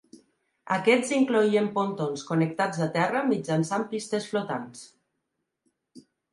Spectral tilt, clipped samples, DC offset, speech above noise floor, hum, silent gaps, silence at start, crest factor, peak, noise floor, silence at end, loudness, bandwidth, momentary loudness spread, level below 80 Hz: -5.5 dB/octave; under 0.1%; under 0.1%; 55 dB; none; none; 0.65 s; 20 dB; -8 dBFS; -81 dBFS; 0.35 s; -26 LUFS; 11.5 kHz; 9 LU; -74 dBFS